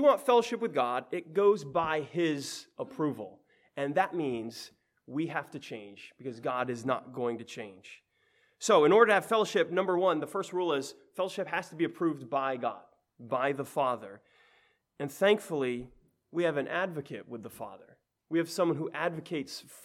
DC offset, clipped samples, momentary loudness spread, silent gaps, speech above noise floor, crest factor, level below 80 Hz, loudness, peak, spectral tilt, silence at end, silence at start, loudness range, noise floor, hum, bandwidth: under 0.1%; under 0.1%; 17 LU; none; 40 dB; 22 dB; -74 dBFS; -30 LUFS; -10 dBFS; -5 dB/octave; 0.05 s; 0 s; 9 LU; -70 dBFS; none; 15.5 kHz